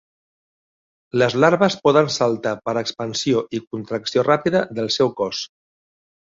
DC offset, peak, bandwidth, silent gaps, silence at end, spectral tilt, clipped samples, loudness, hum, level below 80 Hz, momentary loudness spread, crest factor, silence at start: under 0.1%; -2 dBFS; 7.8 kHz; 3.67-3.71 s; 0.85 s; -5 dB/octave; under 0.1%; -20 LUFS; none; -60 dBFS; 11 LU; 18 dB; 1.15 s